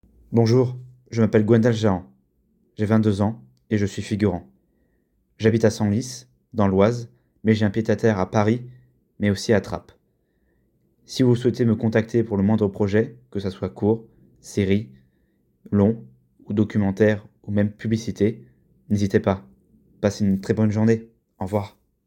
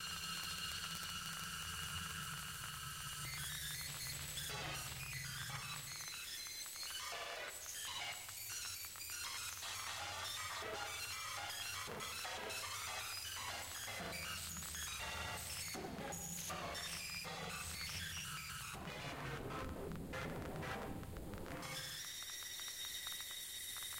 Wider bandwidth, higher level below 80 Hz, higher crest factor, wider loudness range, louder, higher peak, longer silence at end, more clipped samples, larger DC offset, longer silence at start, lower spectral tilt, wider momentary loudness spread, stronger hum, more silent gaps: second, 11.5 kHz vs 16.5 kHz; first, -56 dBFS vs -62 dBFS; about the same, 18 dB vs 22 dB; about the same, 3 LU vs 2 LU; first, -22 LUFS vs -44 LUFS; first, -4 dBFS vs -24 dBFS; first, 0.4 s vs 0 s; neither; neither; first, 0.3 s vs 0 s; first, -7.5 dB/octave vs -2 dB/octave; first, 11 LU vs 3 LU; neither; neither